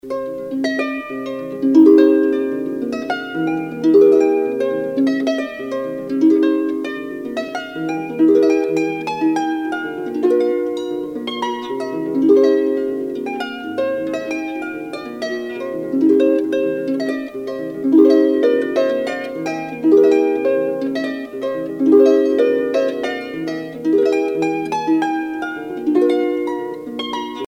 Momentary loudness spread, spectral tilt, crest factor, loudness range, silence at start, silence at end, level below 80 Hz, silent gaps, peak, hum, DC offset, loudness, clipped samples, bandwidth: 13 LU; -6 dB/octave; 16 dB; 4 LU; 0.05 s; 0 s; -60 dBFS; none; 0 dBFS; none; under 0.1%; -18 LUFS; under 0.1%; 9.6 kHz